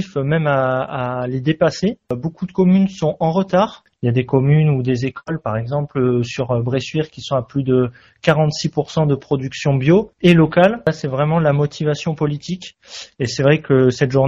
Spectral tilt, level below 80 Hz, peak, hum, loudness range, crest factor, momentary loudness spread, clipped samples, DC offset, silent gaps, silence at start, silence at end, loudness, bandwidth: -6.5 dB/octave; -48 dBFS; 0 dBFS; none; 3 LU; 18 dB; 10 LU; under 0.1%; under 0.1%; none; 0 s; 0 s; -18 LUFS; 7.8 kHz